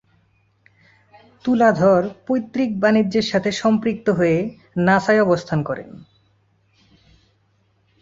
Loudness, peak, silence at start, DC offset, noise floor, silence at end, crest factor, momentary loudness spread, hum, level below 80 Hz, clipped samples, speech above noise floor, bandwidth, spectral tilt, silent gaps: -19 LUFS; -2 dBFS; 1.45 s; under 0.1%; -62 dBFS; 2.05 s; 18 dB; 9 LU; none; -56 dBFS; under 0.1%; 44 dB; 7.8 kHz; -6.5 dB/octave; none